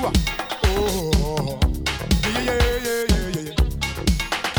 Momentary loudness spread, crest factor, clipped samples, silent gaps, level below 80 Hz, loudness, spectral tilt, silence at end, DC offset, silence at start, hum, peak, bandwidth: 3 LU; 16 dB; under 0.1%; none; -26 dBFS; -22 LUFS; -4.5 dB/octave; 0 s; under 0.1%; 0 s; none; -4 dBFS; over 20 kHz